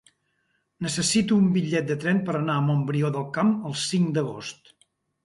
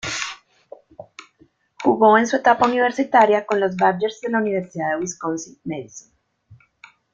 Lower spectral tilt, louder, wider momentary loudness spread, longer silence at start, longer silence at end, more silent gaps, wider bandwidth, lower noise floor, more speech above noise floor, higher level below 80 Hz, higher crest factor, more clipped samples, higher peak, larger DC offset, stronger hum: about the same, -5 dB/octave vs -4.5 dB/octave; second, -24 LUFS vs -19 LUFS; second, 9 LU vs 16 LU; first, 0.8 s vs 0.05 s; about the same, 0.7 s vs 0.6 s; neither; first, 11.5 kHz vs 9 kHz; first, -72 dBFS vs -58 dBFS; first, 49 dB vs 39 dB; about the same, -62 dBFS vs -62 dBFS; about the same, 16 dB vs 20 dB; neither; second, -10 dBFS vs -2 dBFS; neither; neither